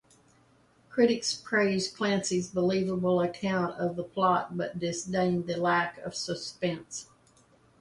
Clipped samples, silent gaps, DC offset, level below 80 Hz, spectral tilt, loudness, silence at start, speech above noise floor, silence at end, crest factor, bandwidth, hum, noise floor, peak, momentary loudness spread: under 0.1%; none; under 0.1%; -66 dBFS; -4.5 dB/octave; -29 LUFS; 0.9 s; 34 dB; 0.75 s; 20 dB; 11.5 kHz; none; -63 dBFS; -10 dBFS; 8 LU